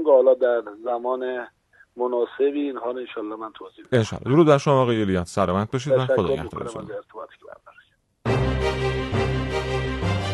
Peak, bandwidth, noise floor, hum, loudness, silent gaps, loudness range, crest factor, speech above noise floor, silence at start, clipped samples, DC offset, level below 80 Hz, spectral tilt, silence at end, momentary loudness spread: -4 dBFS; 12 kHz; -57 dBFS; none; -23 LUFS; none; 6 LU; 20 dB; 36 dB; 0 s; under 0.1%; under 0.1%; -40 dBFS; -7 dB/octave; 0 s; 17 LU